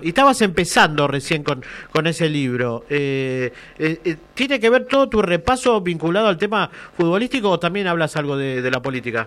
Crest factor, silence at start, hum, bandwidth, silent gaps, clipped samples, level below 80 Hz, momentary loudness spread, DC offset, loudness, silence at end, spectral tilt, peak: 16 dB; 0 s; none; 14.5 kHz; none; under 0.1%; -46 dBFS; 8 LU; under 0.1%; -19 LUFS; 0 s; -5 dB/octave; -2 dBFS